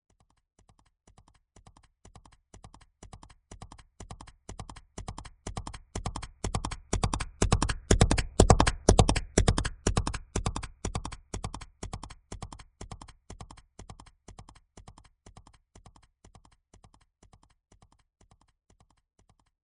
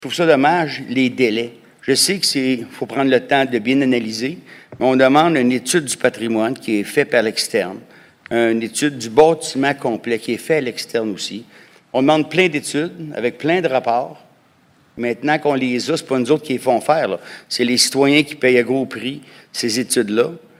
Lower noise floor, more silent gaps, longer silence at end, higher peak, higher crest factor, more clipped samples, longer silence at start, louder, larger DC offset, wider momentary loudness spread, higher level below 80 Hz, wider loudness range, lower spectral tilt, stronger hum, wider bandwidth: first, -61 dBFS vs -54 dBFS; neither; first, 4.75 s vs 0.2 s; about the same, -2 dBFS vs 0 dBFS; first, 30 dB vs 18 dB; neither; first, 2.65 s vs 0 s; second, -29 LUFS vs -17 LUFS; neither; first, 28 LU vs 11 LU; first, -38 dBFS vs -62 dBFS; first, 25 LU vs 3 LU; about the same, -4.5 dB/octave vs -4 dB/octave; neither; second, 11 kHz vs 16 kHz